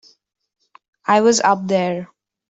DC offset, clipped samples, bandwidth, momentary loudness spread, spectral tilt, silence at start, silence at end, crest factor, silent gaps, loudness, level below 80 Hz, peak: under 0.1%; under 0.1%; 8.2 kHz; 13 LU; -4 dB/octave; 1.1 s; 0.45 s; 16 dB; none; -17 LUFS; -64 dBFS; -2 dBFS